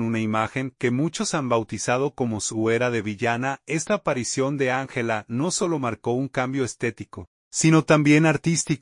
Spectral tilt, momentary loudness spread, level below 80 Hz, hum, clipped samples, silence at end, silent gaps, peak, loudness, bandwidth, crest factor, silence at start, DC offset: -5 dB/octave; 9 LU; -60 dBFS; none; under 0.1%; 0.05 s; 7.27-7.51 s; -6 dBFS; -23 LUFS; 11 kHz; 18 dB; 0 s; under 0.1%